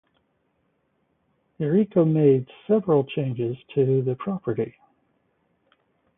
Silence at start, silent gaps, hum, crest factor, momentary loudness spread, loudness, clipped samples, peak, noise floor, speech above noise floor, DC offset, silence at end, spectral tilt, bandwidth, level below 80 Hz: 1.6 s; none; none; 18 dB; 10 LU; -23 LUFS; under 0.1%; -6 dBFS; -70 dBFS; 48 dB; under 0.1%; 1.5 s; -13 dB/octave; 3.8 kHz; -66 dBFS